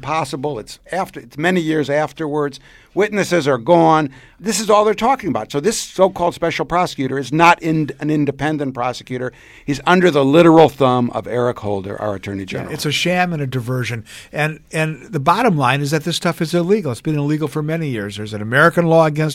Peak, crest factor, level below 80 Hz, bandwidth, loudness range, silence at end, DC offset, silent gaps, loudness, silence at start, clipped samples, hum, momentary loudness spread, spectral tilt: 0 dBFS; 16 dB; -50 dBFS; 16 kHz; 5 LU; 0 s; under 0.1%; none; -17 LUFS; 0 s; under 0.1%; none; 13 LU; -5.5 dB/octave